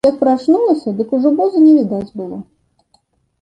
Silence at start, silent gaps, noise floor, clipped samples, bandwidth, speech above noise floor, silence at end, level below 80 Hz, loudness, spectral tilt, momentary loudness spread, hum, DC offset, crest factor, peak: 0.05 s; none; -59 dBFS; under 0.1%; 8.6 kHz; 46 dB; 1 s; -56 dBFS; -13 LUFS; -8.5 dB/octave; 17 LU; none; under 0.1%; 12 dB; -2 dBFS